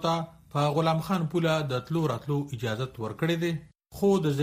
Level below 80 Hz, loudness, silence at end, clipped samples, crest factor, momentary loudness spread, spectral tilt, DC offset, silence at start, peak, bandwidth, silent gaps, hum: -58 dBFS; -28 LUFS; 0 s; under 0.1%; 16 dB; 8 LU; -6.5 dB/octave; under 0.1%; 0 s; -12 dBFS; 15.5 kHz; none; none